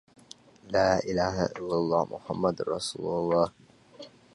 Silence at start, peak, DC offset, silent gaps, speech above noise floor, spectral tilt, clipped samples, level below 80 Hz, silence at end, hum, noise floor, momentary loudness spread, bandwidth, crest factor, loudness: 0.65 s; -10 dBFS; under 0.1%; none; 25 dB; -5.5 dB/octave; under 0.1%; -54 dBFS; 0.25 s; none; -53 dBFS; 8 LU; 11.5 kHz; 18 dB; -28 LUFS